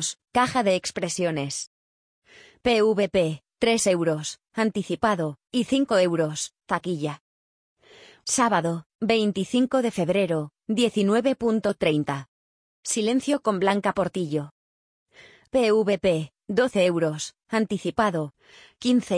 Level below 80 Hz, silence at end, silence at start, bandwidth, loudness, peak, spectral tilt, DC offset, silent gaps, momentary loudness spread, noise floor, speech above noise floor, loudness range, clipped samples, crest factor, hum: -60 dBFS; 0 s; 0 s; 10.5 kHz; -24 LUFS; -6 dBFS; -4.5 dB/octave; under 0.1%; 1.67-2.22 s, 7.21-7.76 s, 8.86-8.99 s, 12.28-12.83 s, 14.51-15.06 s; 9 LU; -52 dBFS; 29 dB; 3 LU; under 0.1%; 18 dB; none